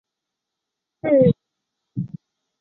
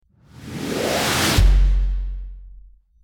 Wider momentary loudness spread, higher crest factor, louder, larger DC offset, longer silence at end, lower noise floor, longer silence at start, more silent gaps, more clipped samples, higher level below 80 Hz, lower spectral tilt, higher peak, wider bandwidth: about the same, 17 LU vs 19 LU; about the same, 20 dB vs 16 dB; about the same, -20 LUFS vs -20 LUFS; neither; about the same, 0.55 s vs 0.45 s; first, -83 dBFS vs -46 dBFS; first, 1.05 s vs 0.4 s; neither; neither; second, -56 dBFS vs -22 dBFS; first, -12 dB/octave vs -4 dB/octave; about the same, -4 dBFS vs -4 dBFS; second, 4.1 kHz vs 18.5 kHz